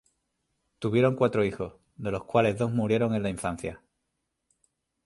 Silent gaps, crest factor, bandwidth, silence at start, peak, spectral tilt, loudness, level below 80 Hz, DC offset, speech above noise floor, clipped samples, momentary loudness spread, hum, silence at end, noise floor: none; 20 dB; 11.5 kHz; 0.8 s; -10 dBFS; -7 dB/octave; -27 LUFS; -56 dBFS; under 0.1%; 54 dB; under 0.1%; 13 LU; none; 1.3 s; -81 dBFS